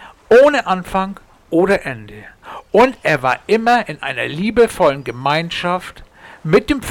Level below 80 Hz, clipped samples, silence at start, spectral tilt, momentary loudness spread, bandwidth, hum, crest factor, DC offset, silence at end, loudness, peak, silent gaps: -44 dBFS; under 0.1%; 0 s; -5.5 dB/octave; 14 LU; 17 kHz; none; 12 dB; under 0.1%; 0 s; -16 LUFS; -4 dBFS; none